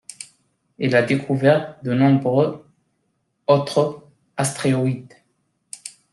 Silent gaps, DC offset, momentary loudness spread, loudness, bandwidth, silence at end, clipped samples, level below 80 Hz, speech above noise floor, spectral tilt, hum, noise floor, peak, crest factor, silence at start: none; under 0.1%; 20 LU; -20 LUFS; 12.5 kHz; 0.25 s; under 0.1%; -64 dBFS; 52 dB; -6 dB/octave; none; -70 dBFS; -4 dBFS; 18 dB; 0.2 s